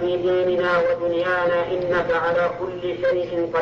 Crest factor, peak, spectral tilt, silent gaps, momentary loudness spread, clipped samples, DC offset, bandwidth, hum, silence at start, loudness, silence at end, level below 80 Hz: 10 dB; -10 dBFS; -6.5 dB/octave; none; 4 LU; under 0.1%; under 0.1%; 6.8 kHz; none; 0 s; -21 LUFS; 0 s; -52 dBFS